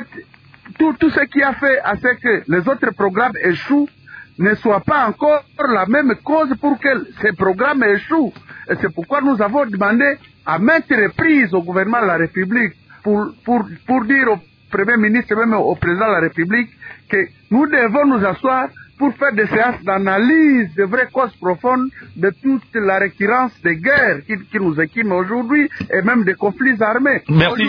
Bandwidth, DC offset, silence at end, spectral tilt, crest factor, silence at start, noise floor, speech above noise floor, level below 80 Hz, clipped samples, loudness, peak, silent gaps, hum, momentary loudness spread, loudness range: 5.2 kHz; under 0.1%; 0 s; -9 dB/octave; 14 dB; 0 s; -43 dBFS; 27 dB; -50 dBFS; under 0.1%; -16 LUFS; -2 dBFS; none; none; 6 LU; 2 LU